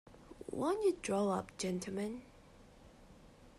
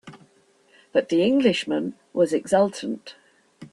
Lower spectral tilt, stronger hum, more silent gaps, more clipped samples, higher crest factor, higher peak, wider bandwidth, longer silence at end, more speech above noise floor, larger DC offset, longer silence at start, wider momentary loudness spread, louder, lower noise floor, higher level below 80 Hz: about the same, -5.5 dB/octave vs -5.5 dB/octave; neither; neither; neither; about the same, 16 dB vs 18 dB; second, -22 dBFS vs -6 dBFS; first, 13.5 kHz vs 12 kHz; about the same, 0.1 s vs 0.05 s; second, 24 dB vs 38 dB; neither; about the same, 0.05 s vs 0.05 s; first, 16 LU vs 12 LU; second, -37 LUFS vs -23 LUFS; about the same, -60 dBFS vs -60 dBFS; about the same, -64 dBFS vs -66 dBFS